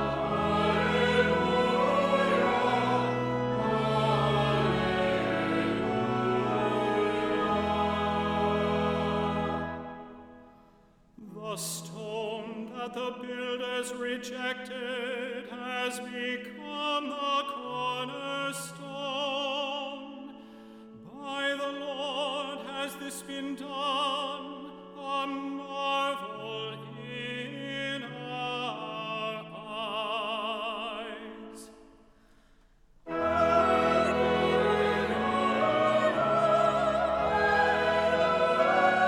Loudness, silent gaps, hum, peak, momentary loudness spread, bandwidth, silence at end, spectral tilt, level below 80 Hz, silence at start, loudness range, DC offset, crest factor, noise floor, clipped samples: -29 LUFS; none; none; -12 dBFS; 14 LU; 17.5 kHz; 0 s; -5 dB/octave; -56 dBFS; 0 s; 10 LU; under 0.1%; 18 dB; -60 dBFS; under 0.1%